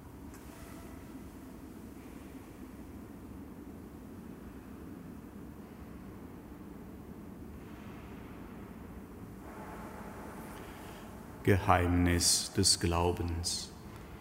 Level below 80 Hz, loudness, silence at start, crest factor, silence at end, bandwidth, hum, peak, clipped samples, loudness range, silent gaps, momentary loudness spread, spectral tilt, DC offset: -52 dBFS; -31 LUFS; 0 s; 28 dB; 0 s; 16 kHz; none; -10 dBFS; under 0.1%; 19 LU; none; 22 LU; -3.5 dB/octave; under 0.1%